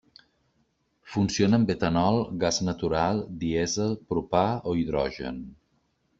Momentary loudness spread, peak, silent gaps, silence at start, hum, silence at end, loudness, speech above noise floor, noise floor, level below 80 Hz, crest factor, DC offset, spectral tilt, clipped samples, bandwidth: 9 LU; -8 dBFS; none; 1.05 s; none; 0.65 s; -26 LUFS; 45 dB; -71 dBFS; -52 dBFS; 20 dB; under 0.1%; -5.5 dB/octave; under 0.1%; 8 kHz